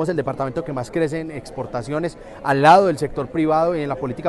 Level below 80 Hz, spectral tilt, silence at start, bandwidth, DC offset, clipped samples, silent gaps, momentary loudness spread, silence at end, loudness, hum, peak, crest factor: -48 dBFS; -6.5 dB/octave; 0 s; 12 kHz; 0.1%; under 0.1%; none; 16 LU; 0 s; -20 LUFS; none; -2 dBFS; 18 dB